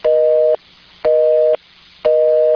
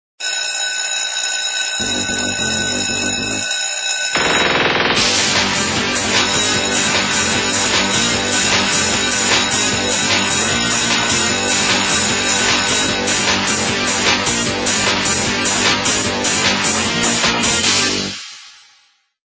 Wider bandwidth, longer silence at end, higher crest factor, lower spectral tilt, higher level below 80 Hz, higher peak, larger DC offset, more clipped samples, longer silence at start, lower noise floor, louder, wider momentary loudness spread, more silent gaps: second, 5.4 kHz vs 8 kHz; second, 0 s vs 0.8 s; second, 10 dB vs 16 dB; first, -5.5 dB/octave vs -1.5 dB/octave; second, -56 dBFS vs -42 dBFS; second, -4 dBFS vs 0 dBFS; neither; neither; second, 0.05 s vs 0.2 s; second, -38 dBFS vs -56 dBFS; about the same, -15 LUFS vs -14 LUFS; first, 9 LU vs 4 LU; neither